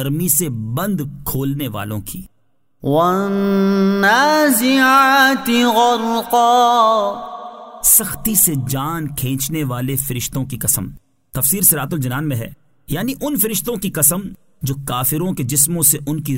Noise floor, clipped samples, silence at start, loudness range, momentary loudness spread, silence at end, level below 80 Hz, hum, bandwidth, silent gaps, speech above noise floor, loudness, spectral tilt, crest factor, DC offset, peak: -66 dBFS; under 0.1%; 0 s; 6 LU; 14 LU; 0 s; -44 dBFS; none; 16.5 kHz; none; 50 dB; -15 LUFS; -3.5 dB/octave; 16 dB; 0.3%; 0 dBFS